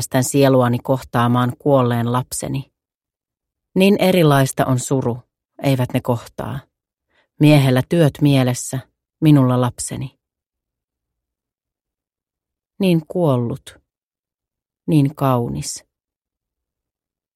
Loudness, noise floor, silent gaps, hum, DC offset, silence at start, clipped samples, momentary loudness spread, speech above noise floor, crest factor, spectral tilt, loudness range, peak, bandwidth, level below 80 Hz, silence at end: -17 LUFS; under -90 dBFS; 2.95-3.00 s, 10.46-10.50 s, 14.05-14.11 s, 14.19-14.23 s; none; under 0.1%; 0 s; under 0.1%; 15 LU; over 74 dB; 18 dB; -6 dB/octave; 7 LU; 0 dBFS; 15.5 kHz; -52 dBFS; 1.55 s